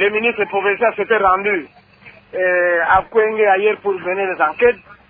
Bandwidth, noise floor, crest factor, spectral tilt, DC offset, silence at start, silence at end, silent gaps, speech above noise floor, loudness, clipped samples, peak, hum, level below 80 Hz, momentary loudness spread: 4.8 kHz; -44 dBFS; 16 dB; -8 dB/octave; under 0.1%; 0 s; 0.15 s; none; 28 dB; -16 LUFS; under 0.1%; 0 dBFS; none; -50 dBFS; 6 LU